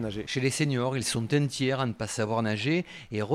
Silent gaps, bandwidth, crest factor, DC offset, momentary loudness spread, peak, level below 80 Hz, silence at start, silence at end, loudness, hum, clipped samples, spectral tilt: none; 13.5 kHz; 16 dB; under 0.1%; 5 LU; -14 dBFS; -58 dBFS; 0 s; 0 s; -28 LUFS; none; under 0.1%; -5 dB/octave